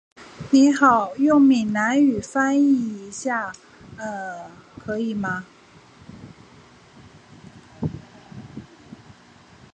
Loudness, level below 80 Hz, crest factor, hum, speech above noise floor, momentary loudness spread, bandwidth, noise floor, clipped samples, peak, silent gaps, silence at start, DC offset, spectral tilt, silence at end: -20 LUFS; -56 dBFS; 20 dB; none; 30 dB; 25 LU; 9 kHz; -50 dBFS; under 0.1%; -4 dBFS; none; 0.2 s; under 0.1%; -5.5 dB/octave; 1.15 s